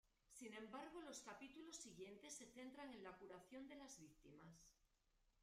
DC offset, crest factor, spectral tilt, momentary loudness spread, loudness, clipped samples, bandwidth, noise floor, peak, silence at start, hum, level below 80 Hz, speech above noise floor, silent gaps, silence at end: under 0.1%; 16 dB; -3 dB/octave; 10 LU; -59 LUFS; under 0.1%; 15 kHz; -83 dBFS; -44 dBFS; 0.05 s; none; -82 dBFS; 24 dB; none; 0 s